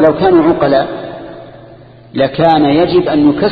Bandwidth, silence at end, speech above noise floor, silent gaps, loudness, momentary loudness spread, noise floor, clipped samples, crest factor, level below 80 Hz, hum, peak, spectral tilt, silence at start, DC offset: 5 kHz; 0 s; 27 dB; none; -11 LUFS; 16 LU; -37 dBFS; under 0.1%; 12 dB; -42 dBFS; none; 0 dBFS; -9.5 dB/octave; 0 s; under 0.1%